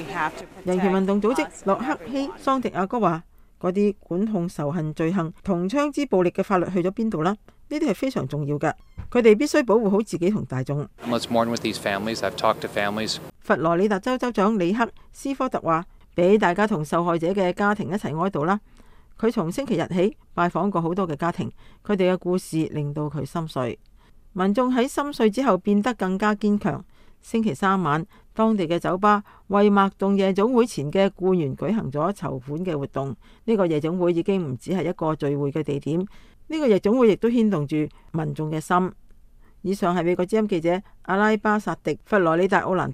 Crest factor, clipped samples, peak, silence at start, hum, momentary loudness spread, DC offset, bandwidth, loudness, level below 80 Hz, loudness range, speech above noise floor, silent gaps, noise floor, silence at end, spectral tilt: 20 dB; under 0.1%; -4 dBFS; 0 s; none; 9 LU; under 0.1%; 15 kHz; -23 LUFS; -52 dBFS; 3 LU; 27 dB; none; -49 dBFS; 0 s; -6.5 dB/octave